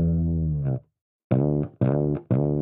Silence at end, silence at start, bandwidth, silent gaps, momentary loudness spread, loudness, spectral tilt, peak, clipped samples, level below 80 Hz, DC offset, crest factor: 0 s; 0 s; 3.6 kHz; 1.01-1.30 s; 4 LU; -25 LUFS; -14.5 dB/octave; -10 dBFS; under 0.1%; -38 dBFS; under 0.1%; 14 dB